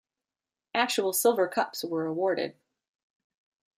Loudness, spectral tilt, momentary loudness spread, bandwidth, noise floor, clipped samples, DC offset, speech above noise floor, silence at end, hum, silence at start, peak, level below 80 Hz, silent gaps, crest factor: -28 LUFS; -3 dB/octave; 8 LU; 15.5 kHz; under -90 dBFS; under 0.1%; under 0.1%; over 63 dB; 1.25 s; none; 0.75 s; -10 dBFS; -82 dBFS; none; 20 dB